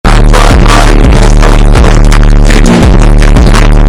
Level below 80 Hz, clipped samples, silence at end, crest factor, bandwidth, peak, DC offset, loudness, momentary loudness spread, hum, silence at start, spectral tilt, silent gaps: -2 dBFS; 20%; 0 s; 2 dB; 12 kHz; 0 dBFS; 3%; -5 LUFS; 1 LU; none; 0.05 s; -5.5 dB/octave; none